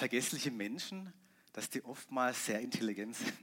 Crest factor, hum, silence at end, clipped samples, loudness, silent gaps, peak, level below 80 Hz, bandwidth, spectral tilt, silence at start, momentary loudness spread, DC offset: 20 dB; none; 0 s; under 0.1%; -38 LUFS; none; -20 dBFS; -90 dBFS; 16.5 kHz; -3 dB/octave; 0 s; 10 LU; under 0.1%